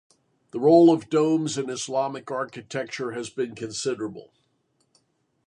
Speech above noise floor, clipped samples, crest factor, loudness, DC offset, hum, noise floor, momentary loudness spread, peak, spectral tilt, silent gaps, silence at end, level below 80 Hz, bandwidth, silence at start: 47 dB; under 0.1%; 20 dB; -24 LUFS; under 0.1%; none; -70 dBFS; 15 LU; -4 dBFS; -5.5 dB/octave; none; 1.25 s; -72 dBFS; 10.5 kHz; 0.55 s